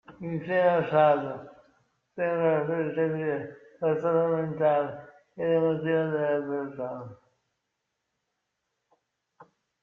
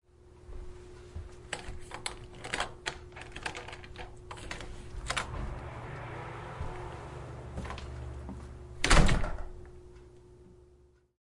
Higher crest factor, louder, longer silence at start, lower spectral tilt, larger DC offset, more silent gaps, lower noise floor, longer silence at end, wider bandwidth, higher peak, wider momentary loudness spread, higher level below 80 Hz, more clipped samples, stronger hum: second, 20 dB vs 26 dB; first, -27 LUFS vs -36 LUFS; second, 0.1 s vs 0.25 s; first, -9.5 dB/octave vs -4 dB/octave; neither; neither; first, -82 dBFS vs -62 dBFS; about the same, 0.4 s vs 0.45 s; second, 4.9 kHz vs 11.5 kHz; about the same, -10 dBFS vs -8 dBFS; second, 14 LU vs 17 LU; second, -72 dBFS vs -38 dBFS; neither; neither